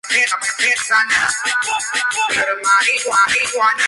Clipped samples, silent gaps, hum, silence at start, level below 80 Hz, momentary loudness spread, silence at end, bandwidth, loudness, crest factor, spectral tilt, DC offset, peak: under 0.1%; none; none; 0.05 s; -58 dBFS; 4 LU; 0 s; 11.5 kHz; -15 LUFS; 14 dB; 1 dB/octave; under 0.1%; -4 dBFS